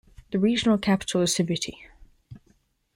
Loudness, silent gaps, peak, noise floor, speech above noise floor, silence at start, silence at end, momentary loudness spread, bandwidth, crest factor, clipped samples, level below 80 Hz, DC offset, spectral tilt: -24 LUFS; none; -8 dBFS; -65 dBFS; 41 dB; 0.3 s; 0.6 s; 9 LU; 16.5 kHz; 18 dB; under 0.1%; -54 dBFS; under 0.1%; -4.5 dB/octave